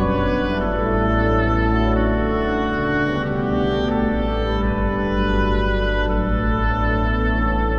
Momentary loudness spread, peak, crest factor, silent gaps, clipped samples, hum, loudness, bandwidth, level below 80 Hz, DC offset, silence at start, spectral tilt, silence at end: 3 LU; -6 dBFS; 14 dB; none; under 0.1%; none; -20 LUFS; 6.6 kHz; -24 dBFS; under 0.1%; 0 s; -8.5 dB/octave; 0 s